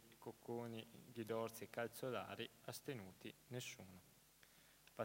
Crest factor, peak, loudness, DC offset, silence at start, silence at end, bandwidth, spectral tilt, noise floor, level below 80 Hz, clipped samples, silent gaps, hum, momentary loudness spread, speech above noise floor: 22 dB; -30 dBFS; -51 LUFS; under 0.1%; 0 s; 0 s; 16 kHz; -4.5 dB/octave; -70 dBFS; -84 dBFS; under 0.1%; none; none; 20 LU; 20 dB